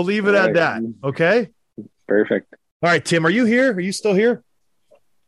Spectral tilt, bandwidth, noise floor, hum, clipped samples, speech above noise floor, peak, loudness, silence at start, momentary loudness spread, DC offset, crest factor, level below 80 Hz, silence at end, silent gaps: -5.5 dB/octave; 12 kHz; -58 dBFS; none; under 0.1%; 41 dB; -4 dBFS; -18 LUFS; 0 s; 9 LU; under 0.1%; 14 dB; -64 dBFS; 0.9 s; 2.71-2.80 s